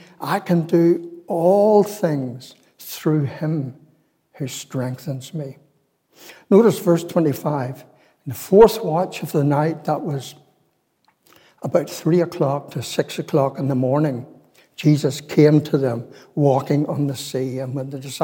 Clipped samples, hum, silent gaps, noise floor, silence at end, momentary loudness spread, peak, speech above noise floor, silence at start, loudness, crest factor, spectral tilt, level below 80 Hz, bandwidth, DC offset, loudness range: under 0.1%; none; none; -66 dBFS; 0 s; 16 LU; -2 dBFS; 46 dB; 0.2 s; -20 LUFS; 18 dB; -7 dB/octave; -58 dBFS; 17 kHz; under 0.1%; 7 LU